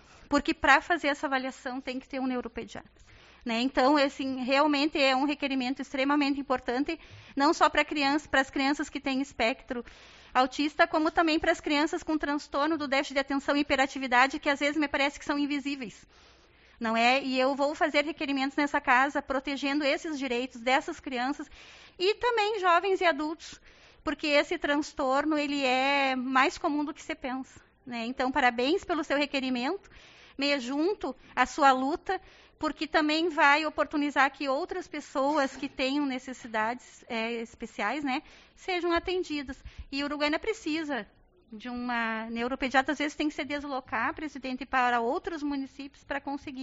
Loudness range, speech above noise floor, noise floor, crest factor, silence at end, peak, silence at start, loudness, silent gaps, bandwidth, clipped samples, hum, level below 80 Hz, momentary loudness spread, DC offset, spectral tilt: 5 LU; 30 dB; -59 dBFS; 24 dB; 0 s; -6 dBFS; 0.3 s; -28 LUFS; none; 8 kHz; under 0.1%; none; -58 dBFS; 12 LU; under 0.1%; -0.5 dB/octave